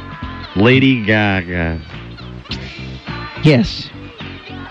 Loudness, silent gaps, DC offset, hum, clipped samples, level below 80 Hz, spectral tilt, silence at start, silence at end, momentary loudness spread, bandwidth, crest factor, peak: -15 LUFS; none; under 0.1%; none; under 0.1%; -36 dBFS; -7 dB/octave; 0 s; 0 s; 19 LU; 8.2 kHz; 16 dB; -2 dBFS